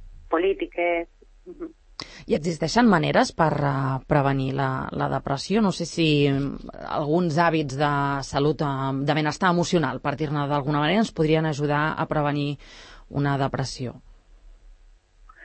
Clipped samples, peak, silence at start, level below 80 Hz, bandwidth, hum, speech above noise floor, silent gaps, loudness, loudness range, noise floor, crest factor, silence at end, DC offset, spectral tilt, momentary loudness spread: under 0.1%; -4 dBFS; 0 s; -48 dBFS; 8.8 kHz; none; 30 dB; none; -24 LUFS; 3 LU; -53 dBFS; 20 dB; 0 s; under 0.1%; -6 dB/octave; 11 LU